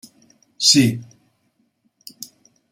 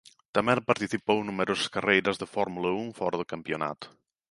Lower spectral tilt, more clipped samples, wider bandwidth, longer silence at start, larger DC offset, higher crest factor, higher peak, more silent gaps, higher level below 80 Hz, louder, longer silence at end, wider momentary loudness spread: second, -3 dB/octave vs -4.5 dB/octave; neither; first, 16 kHz vs 11.5 kHz; first, 0.6 s vs 0.35 s; neither; about the same, 22 dB vs 22 dB; first, 0 dBFS vs -8 dBFS; neither; about the same, -64 dBFS vs -64 dBFS; first, -15 LUFS vs -28 LUFS; first, 1.7 s vs 0.45 s; first, 25 LU vs 10 LU